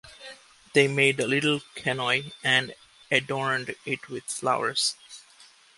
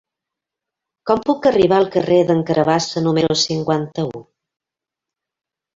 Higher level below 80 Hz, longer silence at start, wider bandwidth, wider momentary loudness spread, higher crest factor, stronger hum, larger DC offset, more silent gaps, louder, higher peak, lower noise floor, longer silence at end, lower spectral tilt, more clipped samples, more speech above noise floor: second, -68 dBFS vs -54 dBFS; second, 0.05 s vs 1.05 s; first, 11.5 kHz vs 7.8 kHz; first, 21 LU vs 10 LU; about the same, 22 dB vs 18 dB; neither; neither; neither; second, -25 LUFS vs -17 LUFS; about the same, -4 dBFS vs -2 dBFS; second, -55 dBFS vs -86 dBFS; second, 0.6 s vs 1.55 s; second, -3.5 dB/octave vs -5.5 dB/octave; neither; second, 29 dB vs 70 dB